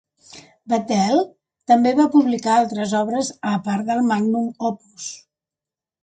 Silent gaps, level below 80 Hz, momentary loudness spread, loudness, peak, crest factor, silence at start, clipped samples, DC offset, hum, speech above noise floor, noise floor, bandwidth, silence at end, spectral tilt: none; -64 dBFS; 16 LU; -19 LUFS; -4 dBFS; 18 dB; 0.35 s; under 0.1%; under 0.1%; none; 70 dB; -89 dBFS; 9.2 kHz; 0.85 s; -5.5 dB/octave